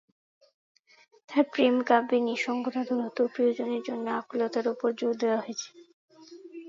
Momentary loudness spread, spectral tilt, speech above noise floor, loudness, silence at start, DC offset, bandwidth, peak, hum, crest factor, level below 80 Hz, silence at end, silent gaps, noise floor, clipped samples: 8 LU; -4 dB/octave; 19 dB; -28 LUFS; 1.3 s; under 0.1%; 7.6 kHz; -10 dBFS; none; 20 dB; -82 dBFS; 0 s; 5.93-6.08 s; -47 dBFS; under 0.1%